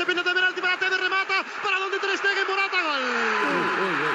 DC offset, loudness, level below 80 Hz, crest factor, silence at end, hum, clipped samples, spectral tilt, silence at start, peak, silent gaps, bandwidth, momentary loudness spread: under 0.1%; -23 LUFS; -86 dBFS; 14 dB; 0 s; none; under 0.1%; -2.5 dB/octave; 0 s; -10 dBFS; none; 12 kHz; 3 LU